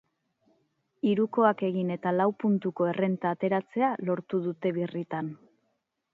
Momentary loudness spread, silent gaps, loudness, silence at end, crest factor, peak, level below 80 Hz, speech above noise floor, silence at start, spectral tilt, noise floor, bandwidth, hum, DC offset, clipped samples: 8 LU; none; -28 LUFS; 0.8 s; 20 dB; -8 dBFS; -78 dBFS; 50 dB; 1.05 s; -10 dB/octave; -77 dBFS; 4.5 kHz; none; under 0.1%; under 0.1%